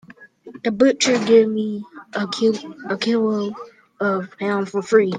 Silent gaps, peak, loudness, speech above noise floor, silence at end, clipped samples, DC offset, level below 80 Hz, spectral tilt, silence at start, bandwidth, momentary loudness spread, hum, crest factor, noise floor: none; -2 dBFS; -20 LUFS; 24 dB; 0 s; under 0.1%; under 0.1%; -66 dBFS; -4.5 dB/octave; 0.1 s; 9.6 kHz; 13 LU; none; 18 dB; -43 dBFS